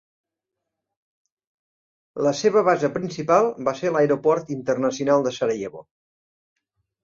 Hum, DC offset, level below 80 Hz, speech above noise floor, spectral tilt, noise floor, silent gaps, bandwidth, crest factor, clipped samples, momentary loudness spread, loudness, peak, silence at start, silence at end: none; under 0.1%; -66 dBFS; 63 dB; -5.5 dB/octave; -84 dBFS; none; 7.6 kHz; 20 dB; under 0.1%; 7 LU; -22 LUFS; -4 dBFS; 2.15 s; 1.25 s